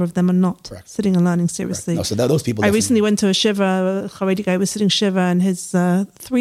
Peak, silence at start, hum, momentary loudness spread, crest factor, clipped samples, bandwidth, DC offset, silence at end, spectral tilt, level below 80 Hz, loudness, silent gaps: -4 dBFS; 0 s; none; 6 LU; 14 dB; under 0.1%; 15.5 kHz; under 0.1%; 0 s; -5 dB/octave; -52 dBFS; -18 LUFS; none